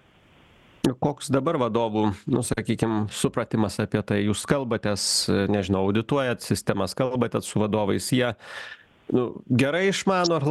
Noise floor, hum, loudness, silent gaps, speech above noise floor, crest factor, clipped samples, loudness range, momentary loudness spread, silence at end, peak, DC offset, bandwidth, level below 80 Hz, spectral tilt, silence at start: -56 dBFS; none; -24 LUFS; none; 32 dB; 22 dB; under 0.1%; 2 LU; 5 LU; 0 s; -4 dBFS; under 0.1%; 13 kHz; -54 dBFS; -5 dB/octave; 0.85 s